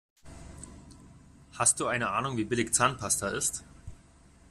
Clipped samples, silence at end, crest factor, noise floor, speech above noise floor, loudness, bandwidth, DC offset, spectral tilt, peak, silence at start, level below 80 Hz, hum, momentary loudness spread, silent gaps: under 0.1%; 0.55 s; 24 dB; -57 dBFS; 28 dB; -28 LUFS; 14.5 kHz; under 0.1%; -2.5 dB/octave; -8 dBFS; 0.25 s; -54 dBFS; none; 22 LU; none